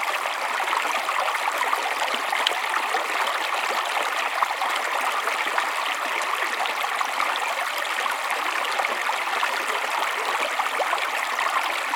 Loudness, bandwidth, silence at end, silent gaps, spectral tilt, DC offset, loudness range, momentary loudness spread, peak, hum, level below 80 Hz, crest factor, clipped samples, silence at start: -24 LUFS; 19 kHz; 0 s; none; 1.5 dB/octave; under 0.1%; 1 LU; 1 LU; -4 dBFS; none; -86 dBFS; 22 dB; under 0.1%; 0 s